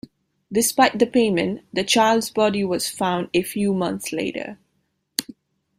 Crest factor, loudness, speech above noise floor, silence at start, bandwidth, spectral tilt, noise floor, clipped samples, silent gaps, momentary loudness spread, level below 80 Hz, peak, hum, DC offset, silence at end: 22 dB; -21 LUFS; 50 dB; 0.5 s; 16 kHz; -3.5 dB/octave; -71 dBFS; under 0.1%; none; 11 LU; -60 dBFS; 0 dBFS; none; under 0.1%; 0.55 s